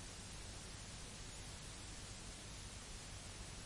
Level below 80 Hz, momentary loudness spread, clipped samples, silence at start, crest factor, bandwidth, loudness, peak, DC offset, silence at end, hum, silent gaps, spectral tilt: -58 dBFS; 0 LU; under 0.1%; 0 s; 14 dB; 11.5 kHz; -51 LUFS; -38 dBFS; under 0.1%; 0 s; none; none; -2.5 dB/octave